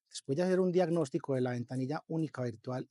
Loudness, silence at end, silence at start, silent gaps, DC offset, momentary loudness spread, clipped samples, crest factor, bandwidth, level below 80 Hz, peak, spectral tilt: -34 LUFS; 0.05 s; 0.15 s; none; under 0.1%; 8 LU; under 0.1%; 16 dB; 11.5 kHz; -88 dBFS; -18 dBFS; -7 dB/octave